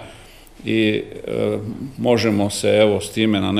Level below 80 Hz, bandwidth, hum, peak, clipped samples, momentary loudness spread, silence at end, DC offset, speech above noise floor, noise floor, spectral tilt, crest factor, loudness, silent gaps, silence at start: -48 dBFS; 15.5 kHz; none; 0 dBFS; under 0.1%; 11 LU; 0 s; under 0.1%; 24 dB; -42 dBFS; -5.5 dB/octave; 18 dB; -19 LUFS; none; 0 s